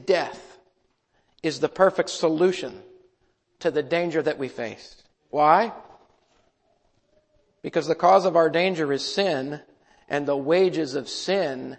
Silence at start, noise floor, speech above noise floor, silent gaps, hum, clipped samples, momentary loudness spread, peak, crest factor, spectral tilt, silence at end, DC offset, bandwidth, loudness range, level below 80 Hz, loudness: 0 s; -69 dBFS; 46 dB; none; none; under 0.1%; 15 LU; -4 dBFS; 22 dB; -5 dB/octave; 0.05 s; under 0.1%; 8.8 kHz; 4 LU; -68 dBFS; -23 LUFS